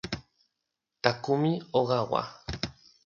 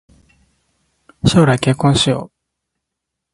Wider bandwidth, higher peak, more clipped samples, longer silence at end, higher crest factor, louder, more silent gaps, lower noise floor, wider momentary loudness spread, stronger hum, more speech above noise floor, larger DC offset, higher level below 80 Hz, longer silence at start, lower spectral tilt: second, 7.4 kHz vs 11.5 kHz; second, -4 dBFS vs 0 dBFS; neither; second, 0.35 s vs 1.1 s; first, 26 dB vs 18 dB; second, -30 LUFS vs -14 LUFS; neither; first, -84 dBFS vs -79 dBFS; first, 12 LU vs 6 LU; neither; second, 57 dB vs 66 dB; neither; second, -54 dBFS vs -40 dBFS; second, 0.05 s vs 1.25 s; about the same, -6 dB/octave vs -5.5 dB/octave